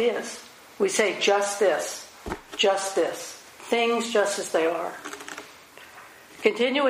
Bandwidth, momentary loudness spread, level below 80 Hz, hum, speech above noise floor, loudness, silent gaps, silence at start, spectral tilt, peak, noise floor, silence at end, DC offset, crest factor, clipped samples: 15.5 kHz; 22 LU; -58 dBFS; none; 24 dB; -24 LUFS; none; 0 s; -2 dB/octave; -6 dBFS; -47 dBFS; 0 s; under 0.1%; 20 dB; under 0.1%